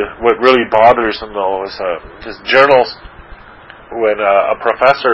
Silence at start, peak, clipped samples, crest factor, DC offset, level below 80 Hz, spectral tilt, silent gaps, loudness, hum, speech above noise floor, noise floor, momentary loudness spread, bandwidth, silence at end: 0 s; 0 dBFS; 0.3%; 14 dB; under 0.1%; -42 dBFS; -5.5 dB/octave; none; -12 LUFS; none; 25 dB; -37 dBFS; 15 LU; 8 kHz; 0 s